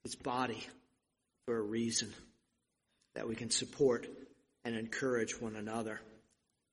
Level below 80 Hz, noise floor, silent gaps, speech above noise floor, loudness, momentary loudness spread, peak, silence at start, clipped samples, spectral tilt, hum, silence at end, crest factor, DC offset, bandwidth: -72 dBFS; -83 dBFS; none; 46 dB; -38 LUFS; 17 LU; -20 dBFS; 0.05 s; under 0.1%; -3.5 dB/octave; none; 0.55 s; 20 dB; under 0.1%; 11.5 kHz